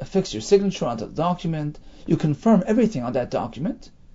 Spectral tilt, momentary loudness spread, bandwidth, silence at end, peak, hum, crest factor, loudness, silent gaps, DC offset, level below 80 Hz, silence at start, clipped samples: -7 dB/octave; 11 LU; 7.8 kHz; 0.25 s; -4 dBFS; none; 18 dB; -23 LUFS; none; under 0.1%; -46 dBFS; 0 s; under 0.1%